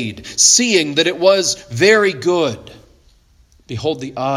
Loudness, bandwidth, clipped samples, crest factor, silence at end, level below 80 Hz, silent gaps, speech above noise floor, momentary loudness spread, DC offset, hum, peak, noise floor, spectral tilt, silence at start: -14 LUFS; 16 kHz; under 0.1%; 16 dB; 0 s; -52 dBFS; none; 36 dB; 13 LU; under 0.1%; none; 0 dBFS; -52 dBFS; -2.5 dB/octave; 0 s